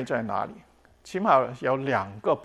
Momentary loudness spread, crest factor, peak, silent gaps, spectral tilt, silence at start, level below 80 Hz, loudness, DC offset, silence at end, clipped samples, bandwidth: 11 LU; 20 dB; -6 dBFS; none; -6.5 dB/octave; 0 s; -64 dBFS; -26 LUFS; under 0.1%; 0 s; under 0.1%; 12 kHz